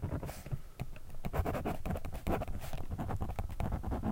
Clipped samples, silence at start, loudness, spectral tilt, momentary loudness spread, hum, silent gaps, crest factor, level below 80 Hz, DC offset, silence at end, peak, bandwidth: under 0.1%; 0 s; -40 LUFS; -7 dB/octave; 8 LU; none; none; 16 dB; -42 dBFS; under 0.1%; 0 s; -20 dBFS; 17 kHz